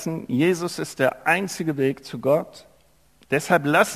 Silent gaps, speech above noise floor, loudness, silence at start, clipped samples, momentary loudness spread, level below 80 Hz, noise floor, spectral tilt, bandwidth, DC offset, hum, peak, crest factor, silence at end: none; 37 dB; -23 LUFS; 0 s; under 0.1%; 7 LU; -64 dBFS; -59 dBFS; -5 dB/octave; 15 kHz; under 0.1%; none; -4 dBFS; 18 dB; 0 s